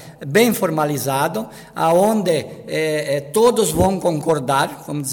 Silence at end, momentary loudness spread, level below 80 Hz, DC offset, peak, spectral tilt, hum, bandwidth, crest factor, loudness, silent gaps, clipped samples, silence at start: 0 s; 8 LU; -46 dBFS; under 0.1%; -2 dBFS; -5 dB/octave; none; 17 kHz; 16 dB; -18 LUFS; none; under 0.1%; 0 s